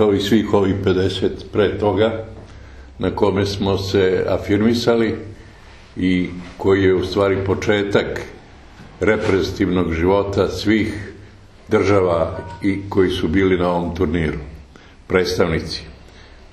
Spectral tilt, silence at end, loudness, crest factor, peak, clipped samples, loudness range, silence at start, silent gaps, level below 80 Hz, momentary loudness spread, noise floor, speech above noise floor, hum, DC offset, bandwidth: -6.5 dB/octave; 0.55 s; -18 LUFS; 18 dB; 0 dBFS; under 0.1%; 1 LU; 0 s; none; -38 dBFS; 11 LU; -43 dBFS; 25 dB; none; under 0.1%; 13 kHz